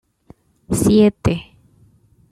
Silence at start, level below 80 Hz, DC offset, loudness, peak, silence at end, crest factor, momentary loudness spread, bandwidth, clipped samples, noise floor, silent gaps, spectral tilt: 0.7 s; -40 dBFS; under 0.1%; -17 LUFS; -4 dBFS; 0.9 s; 16 dB; 11 LU; 14 kHz; under 0.1%; -53 dBFS; none; -6.5 dB/octave